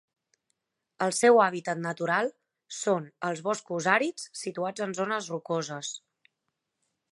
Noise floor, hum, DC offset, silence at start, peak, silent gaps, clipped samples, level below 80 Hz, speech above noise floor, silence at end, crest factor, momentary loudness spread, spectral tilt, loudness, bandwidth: -83 dBFS; none; under 0.1%; 1 s; -8 dBFS; none; under 0.1%; -82 dBFS; 55 dB; 1.15 s; 22 dB; 14 LU; -4 dB/octave; -28 LUFS; 11.5 kHz